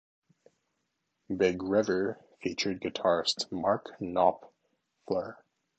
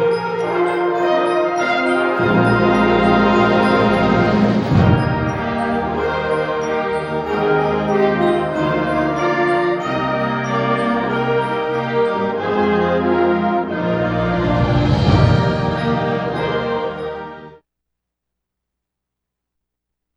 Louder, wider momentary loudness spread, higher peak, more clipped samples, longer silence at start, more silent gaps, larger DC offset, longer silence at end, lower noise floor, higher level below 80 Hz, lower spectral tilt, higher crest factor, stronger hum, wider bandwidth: second, -30 LUFS vs -17 LUFS; first, 10 LU vs 6 LU; second, -10 dBFS vs -2 dBFS; neither; first, 1.3 s vs 0 s; neither; neither; second, 0.45 s vs 2.65 s; about the same, -81 dBFS vs -81 dBFS; second, -64 dBFS vs -36 dBFS; second, -4.5 dB/octave vs -7.5 dB/octave; first, 22 dB vs 16 dB; neither; second, 9 kHz vs 11.5 kHz